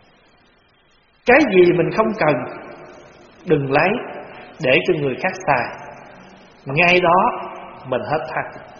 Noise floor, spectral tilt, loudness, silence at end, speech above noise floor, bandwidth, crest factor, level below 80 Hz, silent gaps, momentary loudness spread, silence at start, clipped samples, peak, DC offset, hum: -56 dBFS; -4 dB/octave; -17 LUFS; 0 s; 39 dB; 6.8 kHz; 20 dB; -52 dBFS; none; 22 LU; 1.25 s; under 0.1%; 0 dBFS; under 0.1%; none